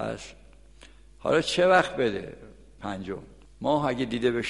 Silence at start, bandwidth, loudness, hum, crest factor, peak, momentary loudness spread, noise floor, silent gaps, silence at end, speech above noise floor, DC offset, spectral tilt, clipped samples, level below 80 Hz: 0 s; 11.5 kHz; -26 LUFS; none; 20 dB; -8 dBFS; 19 LU; -52 dBFS; none; 0 s; 26 dB; 0.1%; -5 dB/octave; under 0.1%; -54 dBFS